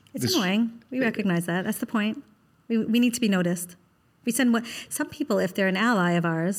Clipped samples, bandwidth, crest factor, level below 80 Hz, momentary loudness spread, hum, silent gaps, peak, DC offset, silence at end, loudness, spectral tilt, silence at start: under 0.1%; 17 kHz; 14 dB; -70 dBFS; 8 LU; none; none; -10 dBFS; under 0.1%; 0 s; -25 LUFS; -5 dB/octave; 0.15 s